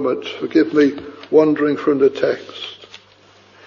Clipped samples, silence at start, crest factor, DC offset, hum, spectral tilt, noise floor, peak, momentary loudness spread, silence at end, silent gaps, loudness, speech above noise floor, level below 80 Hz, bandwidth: under 0.1%; 0 s; 16 dB; under 0.1%; 50 Hz at -50 dBFS; -6.5 dB/octave; -49 dBFS; -2 dBFS; 17 LU; 0.95 s; none; -17 LUFS; 33 dB; -64 dBFS; 7.2 kHz